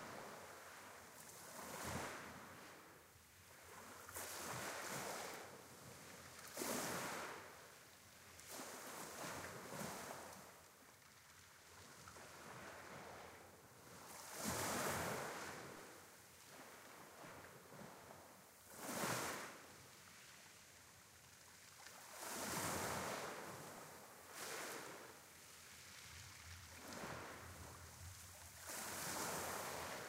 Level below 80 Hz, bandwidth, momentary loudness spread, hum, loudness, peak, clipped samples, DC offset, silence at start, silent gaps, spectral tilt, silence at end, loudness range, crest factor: -76 dBFS; 16 kHz; 17 LU; none; -50 LUFS; -30 dBFS; under 0.1%; under 0.1%; 0 s; none; -2.5 dB/octave; 0 s; 8 LU; 22 dB